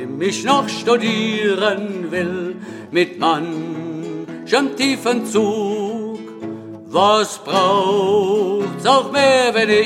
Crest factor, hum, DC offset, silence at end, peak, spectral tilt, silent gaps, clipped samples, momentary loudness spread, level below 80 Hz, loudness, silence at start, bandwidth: 16 dB; none; under 0.1%; 0 s; -2 dBFS; -4 dB/octave; none; under 0.1%; 14 LU; -68 dBFS; -17 LUFS; 0 s; 14.5 kHz